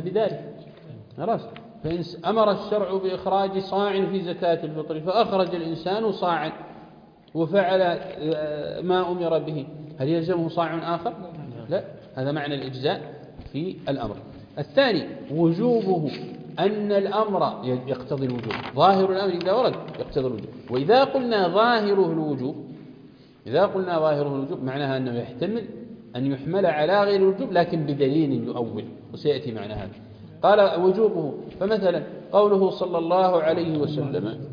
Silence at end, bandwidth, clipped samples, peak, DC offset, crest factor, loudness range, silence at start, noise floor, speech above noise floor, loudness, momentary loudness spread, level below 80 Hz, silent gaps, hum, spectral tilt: 0 s; 5.2 kHz; under 0.1%; -6 dBFS; under 0.1%; 18 dB; 5 LU; 0 s; -49 dBFS; 26 dB; -24 LUFS; 16 LU; -58 dBFS; none; none; -8.5 dB/octave